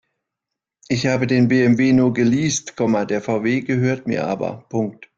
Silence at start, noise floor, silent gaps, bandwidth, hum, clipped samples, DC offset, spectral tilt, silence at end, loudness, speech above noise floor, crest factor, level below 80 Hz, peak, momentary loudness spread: 0.9 s; -84 dBFS; none; 7.8 kHz; none; under 0.1%; under 0.1%; -6 dB/octave; 0.15 s; -19 LUFS; 66 dB; 14 dB; -54 dBFS; -4 dBFS; 10 LU